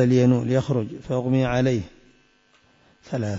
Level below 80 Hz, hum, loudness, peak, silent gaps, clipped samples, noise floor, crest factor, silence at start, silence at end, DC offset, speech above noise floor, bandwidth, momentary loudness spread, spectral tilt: -50 dBFS; none; -23 LUFS; -8 dBFS; none; under 0.1%; -60 dBFS; 16 dB; 0 s; 0 s; under 0.1%; 39 dB; 7.8 kHz; 11 LU; -8 dB/octave